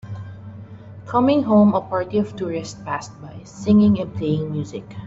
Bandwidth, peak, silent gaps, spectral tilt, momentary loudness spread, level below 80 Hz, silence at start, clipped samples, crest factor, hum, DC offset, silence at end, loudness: 7.8 kHz; -4 dBFS; none; -7.5 dB/octave; 23 LU; -54 dBFS; 0.05 s; under 0.1%; 16 dB; none; under 0.1%; 0 s; -20 LUFS